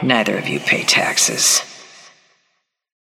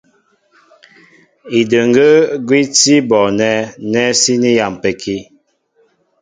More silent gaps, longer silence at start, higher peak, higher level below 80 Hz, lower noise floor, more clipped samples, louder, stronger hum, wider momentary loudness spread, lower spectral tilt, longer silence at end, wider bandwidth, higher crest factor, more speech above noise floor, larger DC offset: neither; second, 0 s vs 1.45 s; about the same, 0 dBFS vs 0 dBFS; second, -66 dBFS vs -54 dBFS; first, -68 dBFS vs -57 dBFS; neither; second, -15 LUFS vs -12 LUFS; neither; about the same, 7 LU vs 9 LU; second, -1.5 dB/octave vs -3.5 dB/octave; first, 1.3 s vs 1 s; first, 16.5 kHz vs 9.6 kHz; first, 20 dB vs 14 dB; first, 52 dB vs 45 dB; neither